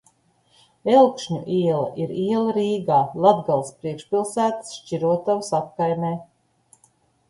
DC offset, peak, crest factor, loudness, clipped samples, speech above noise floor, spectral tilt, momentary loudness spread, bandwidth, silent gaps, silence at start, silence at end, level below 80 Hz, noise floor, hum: under 0.1%; -2 dBFS; 20 dB; -22 LUFS; under 0.1%; 40 dB; -6.5 dB/octave; 12 LU; 11.5 kHz; none; 0.85 s; 1.05 s; -64 dBFS; -61 dBFS; none